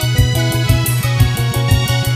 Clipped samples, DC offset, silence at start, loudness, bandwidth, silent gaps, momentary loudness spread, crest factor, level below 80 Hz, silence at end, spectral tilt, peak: under 0.1%; under 0.1%; 0 s; -15 LUFS; 16 kHz; none; 1 LU; 14 dB; -24 dBFS; 0 s; -5 dB/octave; 0 dBFS